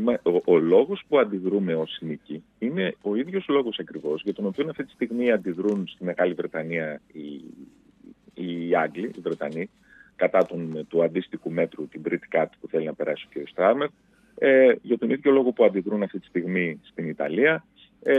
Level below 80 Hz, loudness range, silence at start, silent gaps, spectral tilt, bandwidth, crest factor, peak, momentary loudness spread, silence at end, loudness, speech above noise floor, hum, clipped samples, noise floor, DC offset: -70 dBFS; 7 LU; 0 s; none; -8 dB/octave; 6.2 kHz; 18 dB; -6 dBFS; 13 LU; 0 s; -25 LUFS; 28 dB; none; under 0.1%; -52 dBFS; under 0.1%